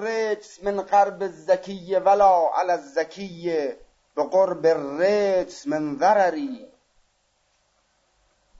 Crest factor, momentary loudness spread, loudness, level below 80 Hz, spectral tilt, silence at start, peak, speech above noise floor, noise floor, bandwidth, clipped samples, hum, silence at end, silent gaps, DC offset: 16 dB; 13 LU; -22 LUFS; -60 dBFS; -5 dB/octave; 0 s; -8 dBFS; 46 dB; -68 dBFS; 8 kHz; under 0.1%; none; 1.95 s; none; under 0.1%